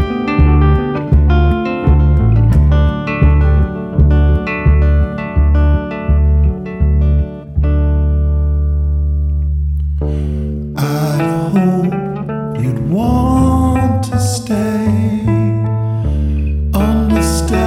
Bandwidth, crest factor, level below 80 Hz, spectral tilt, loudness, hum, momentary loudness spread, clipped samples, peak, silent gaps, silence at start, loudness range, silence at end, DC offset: 13 kHz; 10 dB; -16 dBFS; -7.5 dB/octave; -14 LUFS; none; 7 LU; under 0.1%; -2 dBFS; none; 0 s; 4 LU; 0 s; under 0.1%